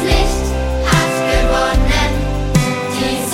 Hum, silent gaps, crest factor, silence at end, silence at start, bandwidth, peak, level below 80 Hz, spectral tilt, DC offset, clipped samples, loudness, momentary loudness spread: none; none; 14 dB; 0 s; 0 s; 16.5 kHz; 0 dBFS; -18 dBFS; -4.5 dB/octave; under 0.1%; under 0.1%; -16 LUFS; 4 LU